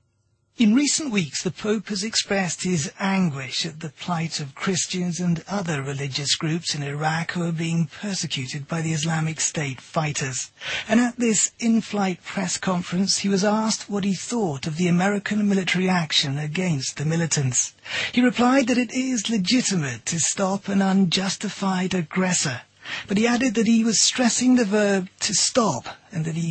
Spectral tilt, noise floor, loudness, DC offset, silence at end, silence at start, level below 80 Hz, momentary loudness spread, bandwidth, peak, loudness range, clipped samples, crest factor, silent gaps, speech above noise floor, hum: -4 dB/octave; -67 dBFS; -22 LUFS; under 0.1%; 0 s; 0.6 s; -60 dBFS; 8 LU; 8.8 kHz; -6 dBFS; 5 LU; under 0.1%; 18 dB; none; 45 dB; none